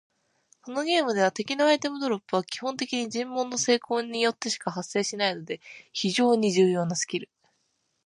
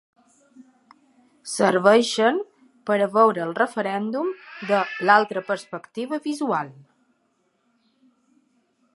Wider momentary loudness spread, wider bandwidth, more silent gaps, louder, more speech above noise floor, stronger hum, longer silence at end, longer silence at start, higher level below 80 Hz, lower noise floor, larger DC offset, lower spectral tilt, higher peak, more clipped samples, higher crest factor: second, 9 LU vs 16 LU; about the same, 11.5 kHz vs 11.5 kHz; neither; second, -26 LUFS vs -22 LUFS; about the same, 48 dB vs 47 dB; neither; second, 0.8 s vs 2.25 s; second, 0.65 s vs 1.45 s; about the same, -78 dBFS vs -80 dBFS; first, -74 dBFS vs -69 dBFS; neither; about the same, -3.5 dB/octave vs -4.5 dB/octave; second, -10 dBFS vs -2 dBFS; neither; about the same, 18 dB vs 22 dB